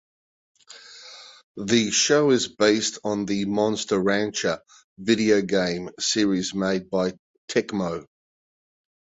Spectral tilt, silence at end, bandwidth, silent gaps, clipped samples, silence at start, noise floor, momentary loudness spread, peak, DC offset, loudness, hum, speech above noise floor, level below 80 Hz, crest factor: -3.5 dB/octave; 1.05 s; 8.2 kHz; 1.44-1.55 s, 4.84-4.96 s, 7.19-7.48 s; under 0.1%; 0.7 s; -46 dBFS; 16 LU; -6 dBFS; under 0.1%; -23 LUFS; none; 23 dB; -60 dBFS; 20 dB